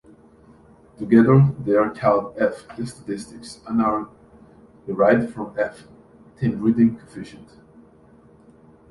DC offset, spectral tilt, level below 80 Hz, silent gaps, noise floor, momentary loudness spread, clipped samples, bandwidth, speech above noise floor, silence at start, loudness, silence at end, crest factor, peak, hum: under 0.1%; -8.5 dB/octave; -54 dBFS; none; -51 dBFS; 21 LU; under 0.1%; 11.5 kHz; 31 dB; 1 s; -20 LUFS; 1.6 s; 20 dB; -2 dBFS; none